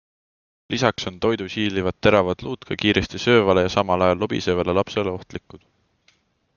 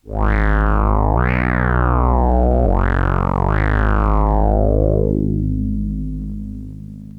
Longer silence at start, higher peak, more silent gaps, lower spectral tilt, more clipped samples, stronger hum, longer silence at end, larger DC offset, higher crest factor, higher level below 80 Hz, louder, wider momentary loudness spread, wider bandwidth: first, 0.7 s vs 0.05 s; about the same, -2 dBFS vs -2 dBFS; neither; second, -5.5 dB/octave vs -10 dB/octave; neither; neither; first, 1 s vs 0 s; neither; first, 20 dB vs 14 dB; second, -48 dBFS vs -18 dBFS; second, -21 LUFS vs -17 LUFS; about the same, 11 LU vs 11 LU; first, 7.2 kHz vs 4 kHz